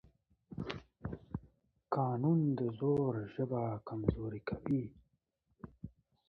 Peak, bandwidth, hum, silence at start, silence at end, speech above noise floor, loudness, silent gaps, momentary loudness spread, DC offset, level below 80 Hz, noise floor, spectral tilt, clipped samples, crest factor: -14 dBFS; 6.2 kHz; none; 0.5 s; 0.4 s; 45 dB; -37 LUFS; none; 20 LU; under 0.1%; -56 dBFS; -80 dBFS; -8.5 dB/octave; under 0.1%; 24 dB